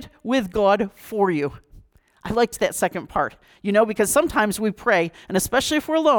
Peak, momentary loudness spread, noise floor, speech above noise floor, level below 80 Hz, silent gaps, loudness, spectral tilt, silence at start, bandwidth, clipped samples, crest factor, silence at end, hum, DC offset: -6 dBFS; 8 LU; -50 dBFS; 30 dB; -48 dBFS; none; -22 LUFS; -4 dB/octave; 0 s; 19.5 kHz; under 0.1%; 16 dB; 0 s; none; under 0.1%